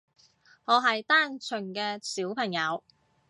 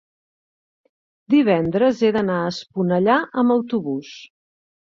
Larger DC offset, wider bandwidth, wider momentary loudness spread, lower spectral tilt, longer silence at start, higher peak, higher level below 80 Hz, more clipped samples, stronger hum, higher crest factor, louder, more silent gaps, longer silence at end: neither; first, 11.5 kHz vs 7.4 kHz; about the same, 11 LU vs 11 LU; second, -3 dB/octave vs -7 dB/octave; second, 0.7 s vs 1.3 s; second, -8 dBFS vs -4 dBFS; second, -82 dBFS vs -60 dBFS; neither; neither; about the same, 22 dB vs 18 dB; second, -27 LUFS vs -19 LUFS; neither; second, 0.5 s vs 0.7 s